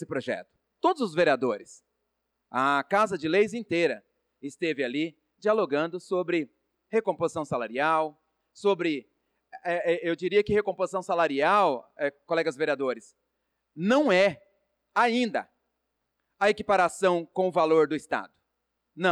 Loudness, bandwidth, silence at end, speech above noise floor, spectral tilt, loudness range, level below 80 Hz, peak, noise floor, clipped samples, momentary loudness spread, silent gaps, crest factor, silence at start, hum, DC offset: -27 LUFS; 12 kHz; 0 s; 55 dB; -5 dB/octave; 3 LU; -66 dBFS; -12 dBFS; -81 dBFS; under 0.1%; 10 LU; none; 16 dB; 0 s; none; under 0.1%